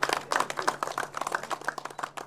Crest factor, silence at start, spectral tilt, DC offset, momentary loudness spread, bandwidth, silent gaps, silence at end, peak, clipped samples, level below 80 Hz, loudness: 24 dB; 0 s; -1.5 dB/octave; under 0.1%; 8 LU; 17 kHz; none; 0 s; -8 dBFS; under 0.1%; -70 dBFS; -31 LUFS